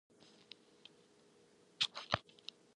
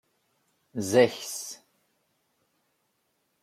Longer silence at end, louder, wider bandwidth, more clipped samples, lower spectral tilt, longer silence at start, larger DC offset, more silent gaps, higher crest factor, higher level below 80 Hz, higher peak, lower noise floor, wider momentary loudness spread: second, 0.55 s vs 1.85 s; second, -40 LUFS vs -26 LUFS; second, 11 kHz vs 15.5 kHz; neither; second, -2.5 dB/octave vs -4 dB/octave; first, 1.8 s vs 0.75 s; neither; neither; first, 32 dB vs 24 dB; first, -70 dBFS vs -76 dBFS; second, -14 dBFS vs -8 dBFS; second, -68 dBFS vs -75 dBFS; first, 24 LU vs 18 LU